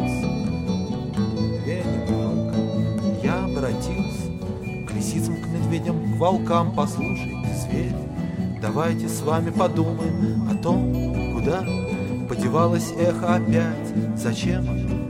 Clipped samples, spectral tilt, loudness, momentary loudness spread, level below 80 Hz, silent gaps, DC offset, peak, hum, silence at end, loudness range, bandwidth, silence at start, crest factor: under 0.1%; -7 dB/octave; -24 LUFS; 6 LU; -38 dBFS; none; under 0.1%; -4 dBFS; none; 0 s; 2 LU; 16 kHz; 0 s; 18 dB